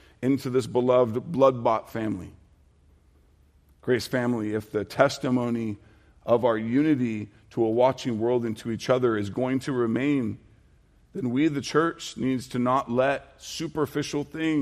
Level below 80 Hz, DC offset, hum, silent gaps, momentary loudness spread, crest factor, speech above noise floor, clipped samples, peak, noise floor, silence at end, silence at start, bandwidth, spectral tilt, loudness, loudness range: -60 dBFS; under 0.1%; none; none; 11 LU; 20 dB; 34 dB; under 0.1%; -6 dBFS; -59 dBFS; 0 s; 0.2 s; 15 kHz; -6 dB/octave; -26 LUFS; 3 LU